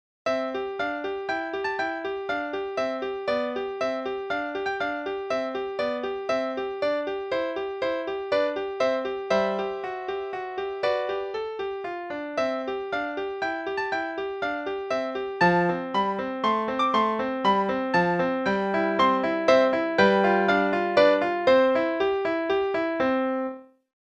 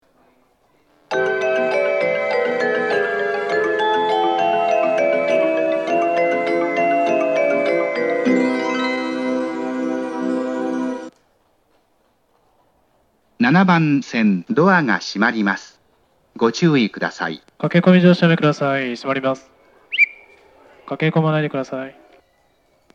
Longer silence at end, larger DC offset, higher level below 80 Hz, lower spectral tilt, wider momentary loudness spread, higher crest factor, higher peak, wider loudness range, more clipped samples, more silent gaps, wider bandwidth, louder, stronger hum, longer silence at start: second, 0.4 s vs 1.05 s; neither; first, -60 dBFS vs -70 dBFS; about the same, -6 dB/octave vs -6.5 dB/octave; about the same, 10 LU vs 9 LU; about the same, 20 dB vs 18 dB; second, -6 dBFS vs 0 dBFS; about the same, 8 LU vs 6 LU; neither; neither; about the same, 8.8 kHz vs 8.8 kHz; second, -26 LUFS vs -18 LUFS; neither; second, 0.25 s vs 1.1 s